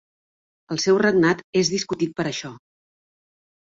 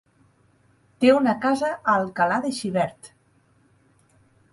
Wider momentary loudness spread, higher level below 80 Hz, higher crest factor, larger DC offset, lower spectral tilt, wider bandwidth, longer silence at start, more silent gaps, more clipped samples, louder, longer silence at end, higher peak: first, 12 LU vs 8 LU; about the same, -62 dBFS vs -64 dBFS; about the same, 18 dB vs 20 dB; neither; about the same, -4.5 dB/octave vs -5.5 dB/octave; second, 7.8 kHz vs 11.5 kHz; second, 0.7 s vs 1 s; first, 1.44-1.53 s vs none; neither; about the same, -21 LUFS vs -22 LUFS; second, 1.1 s vs 1.45 s; about the same, -6 dBFS vs -4 dBFS